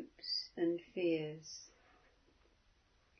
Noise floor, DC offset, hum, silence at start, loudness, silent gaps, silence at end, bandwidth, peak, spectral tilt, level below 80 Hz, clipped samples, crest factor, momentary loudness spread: -72 dBFS; under 0.1%; none; 0 s; -39 LUFS; none; 1.5 s; 6.4 kHz; -26 dBFS; -4 dB/octave; -76 dBFS; under 0.1%; 16 dB; 15 LU